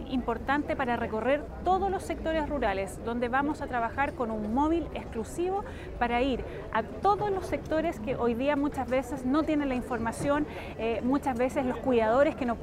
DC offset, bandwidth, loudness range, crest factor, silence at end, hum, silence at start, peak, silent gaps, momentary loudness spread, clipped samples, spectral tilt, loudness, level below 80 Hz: under 0.1%; 15 kHz; 2 LU; 16 dB; 0 s; none; 0 s; -12 dBFS; none; 5 LU; under 0.1%; -6 dB/octave; -29 LUFS; -46 dBFS